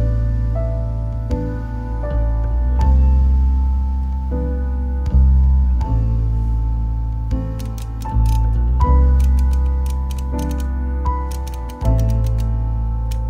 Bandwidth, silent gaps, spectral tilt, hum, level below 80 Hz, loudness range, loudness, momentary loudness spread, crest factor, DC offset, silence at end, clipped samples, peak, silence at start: 6.8 kHz; none; -8.5 dB/octave; none; -18 dBFS; 3 LU; -19 LUFS; 9 LU; 14 dB; under 0.1%; 0 s; under 0.1%; -4 dBFS; 0 s